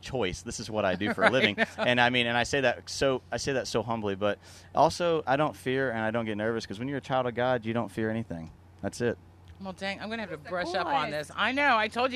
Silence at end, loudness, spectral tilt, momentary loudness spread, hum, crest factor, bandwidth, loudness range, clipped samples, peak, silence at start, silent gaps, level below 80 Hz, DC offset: 0 s; -28 LUFS; -4.5 dB/octave; 12 LU; none; 24 dB; 13.5 kHz; 7 LU; under 0.1%; -6 dBFS; 0.05 s; none; -56 dBFS; under 0.1%